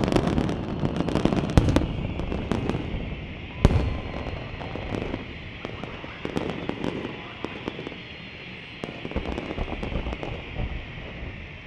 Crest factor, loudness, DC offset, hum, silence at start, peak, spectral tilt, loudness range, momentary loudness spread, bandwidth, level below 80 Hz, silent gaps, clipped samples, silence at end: 28 dB; -29 LUFS; under 0.1%; none; 0 s; 0 dBFS; -7 dB/octave; 8 LU; 13 LU; 12 kHz; -34 dBFS; none; under 0.1%; 0 s